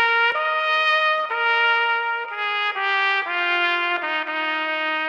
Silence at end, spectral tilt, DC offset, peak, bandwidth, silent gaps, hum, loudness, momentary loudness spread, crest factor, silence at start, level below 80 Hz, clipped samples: 0 s; -1 dB/octave; under 0.1%; -8 dBFS; 8.8 kHz; none; none; -20 LUFS; 6 LU; 14 dB; 0 s; under -90 dBFS; under 0.1%